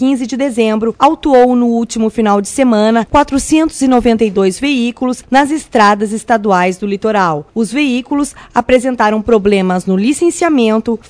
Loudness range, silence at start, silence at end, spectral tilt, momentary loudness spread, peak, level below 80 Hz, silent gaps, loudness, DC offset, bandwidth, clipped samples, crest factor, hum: 2 LU; 0 s; 0.1 s; -5 dB/octave; 6 LU; 0 dBFS; -38 dBFS; none; -12 LUFS; under 0.1%; 11 kHz; 0.7%; 12 dB; none